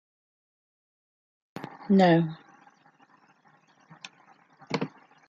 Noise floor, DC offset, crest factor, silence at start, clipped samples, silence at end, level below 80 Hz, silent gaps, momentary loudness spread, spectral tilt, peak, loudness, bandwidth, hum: -62 dBFS; under 0.1%; 22 dB; 1.55 s; under 0.1%; 0.4 s; -74 dBFS; none; 27 LU; -7.5 dB/octave; -8 dBFS; -25 LUFS; 7.8 kHz; none